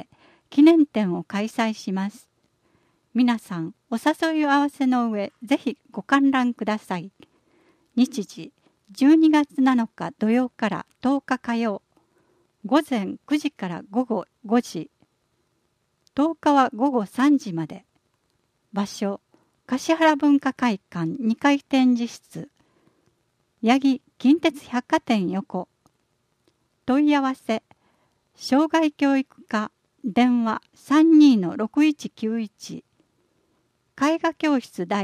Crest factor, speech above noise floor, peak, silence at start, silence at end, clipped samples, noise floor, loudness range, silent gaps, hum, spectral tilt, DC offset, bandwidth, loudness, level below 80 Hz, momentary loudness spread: 18 dB; 49 dB; -4 dBFS; 0.5 s; 0 s; under 0.1%; -71 dBFS; 6 LU; none; none; -5.5 dB/octave; under 0.1%; 13.5 kHz; -22 LUFS; -70 dBFS; 14 LU